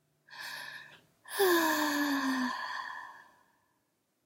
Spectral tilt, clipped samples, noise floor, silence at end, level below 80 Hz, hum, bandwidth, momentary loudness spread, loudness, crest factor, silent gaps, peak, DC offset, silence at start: -1.5 dB/octave; under 0.1%; -78 dBFS; 1.05 s; -86 dBFS; none; 16 kHz; 19 LU; -32 LUFS; 18 dB; none; -16 dBFS; under 0.1%; 0.3 s